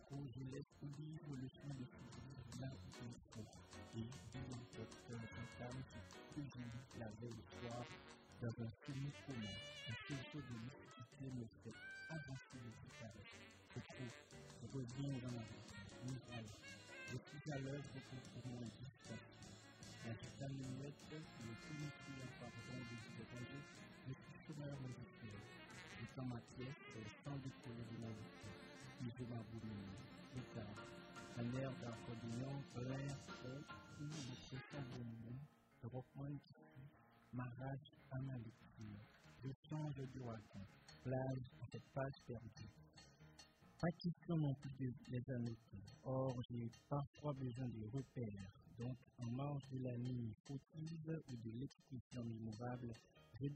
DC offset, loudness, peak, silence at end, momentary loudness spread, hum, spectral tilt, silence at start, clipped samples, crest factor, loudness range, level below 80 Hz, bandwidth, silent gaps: under 0.1%; -52 LUFS; -30 dBFS; 0 s; 10 LU; none; -6.5 dB/octave; 0 s; under 0.1%; 22 dB; 6 LU; -74 dBFS; 10.5 kHz; 39.56-39.63 s, 46.45-46.49 s, 47.07-47.14 s, 50.40-50.44 s, 52.01-52.10 s